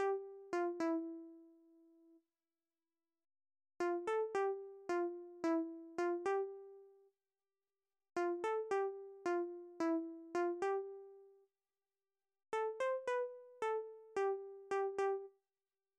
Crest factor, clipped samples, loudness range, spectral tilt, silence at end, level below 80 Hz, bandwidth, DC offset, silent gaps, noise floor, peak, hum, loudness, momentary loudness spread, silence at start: 12 dB; under 0.1%; 5 LU; -4.5 dB/octave; 0.7 s; -90 dBFS; 10 kHz; under 0.1%; none; under -90 dBFS; -30 dBFS; none; -41 LUFS; 9 LU; 0 s